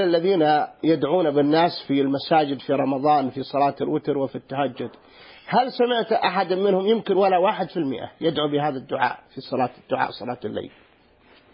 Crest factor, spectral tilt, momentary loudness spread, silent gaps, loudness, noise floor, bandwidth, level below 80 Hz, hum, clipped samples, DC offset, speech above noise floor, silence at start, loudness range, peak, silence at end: 16 dB; -10.5 dB/octave; 10 LU; none; -22 LUFS; -56 dBFS; 5.4 kHz; -64 dBFS; none; under 0.1%; under 0.1%; 34 dB; 0 s; 5 LU; -6 dBFS; 0.85 s